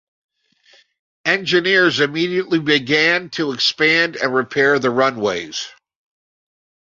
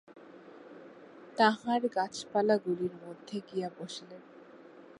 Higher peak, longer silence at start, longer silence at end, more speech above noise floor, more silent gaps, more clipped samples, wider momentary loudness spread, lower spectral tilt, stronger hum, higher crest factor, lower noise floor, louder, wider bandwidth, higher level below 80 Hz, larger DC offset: first, -2 dBFS vs -10 dBFS; first, 1.25 s vs 0.15 s; first, 1.2 s vs 0.2 s; first, 37 dB vs 22 dB; neither; neither; second, 10 LU vs 25 LU; about the same, -4 dB/octave vs -5 dB/octave; neither; second, 18 dB vs 24 dB; about the same, -55 dBFS vs -53 dBFS; first, -16 LUFS vs -32 LUFS; second, 7.6 kHz vs 11.5 kHz; first, -62 dBFS vs -80 dBFS; neither